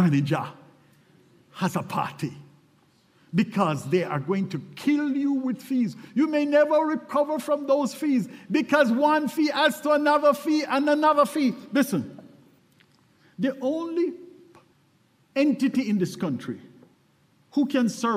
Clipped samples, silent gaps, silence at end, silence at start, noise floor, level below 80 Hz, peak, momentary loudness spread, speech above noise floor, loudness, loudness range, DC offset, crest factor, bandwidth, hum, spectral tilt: under 0.1%; none; 0 s; 0 s; -63 dBFS; -72 dBFS; -6 dBFS; 10 LU; 39 dB; -24 LUFS; 8 LU; under 0.1%; 18 dB; 15.5 kHz; none; -6 dB/octave